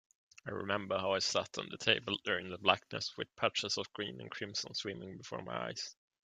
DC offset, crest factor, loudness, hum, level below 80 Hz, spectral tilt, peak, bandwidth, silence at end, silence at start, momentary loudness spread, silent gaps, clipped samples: under 0.1%; 26 dB; -36 LUFS; none; -76 dBFS; -2.5 dB/octave; -12 dBFS; 9.6 kHz; 0.35 s; 0.45 s; 12 LU; none; under 0.1%